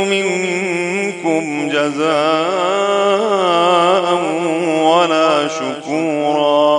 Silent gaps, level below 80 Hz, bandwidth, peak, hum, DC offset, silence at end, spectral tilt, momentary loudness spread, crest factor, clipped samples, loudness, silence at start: none; -72 dBFS; 11 kHz; 0 dBFS; none; under 0.1%; 0 s; -4 dB/octave; 6 LU; 14 dB; under 0.1%; -15 LUFS; 0 s